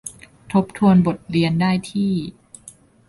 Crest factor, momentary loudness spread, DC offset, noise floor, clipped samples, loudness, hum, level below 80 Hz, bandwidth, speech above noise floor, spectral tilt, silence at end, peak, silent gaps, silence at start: 16 dB; 10 LU; under 0.1%; -47 dBFS; under 0.1%; -19 LUFS; none; -50 dBFS; 11.5 kHz; 29 dB; -7 dB/octave; 0.4 s; -4 dBFS; none; 0.05 s